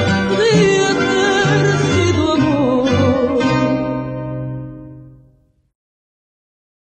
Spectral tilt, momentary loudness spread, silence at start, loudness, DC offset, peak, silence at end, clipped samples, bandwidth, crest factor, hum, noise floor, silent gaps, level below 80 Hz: -5.5 dB/octave; 12 LU; 0 s; -15 LUFS; under 0.1%; -2 dBFS; 1.75 s; under 0.1%; 9 kHz; 14 dB; none; -54 dBFS; none; -42 dBFS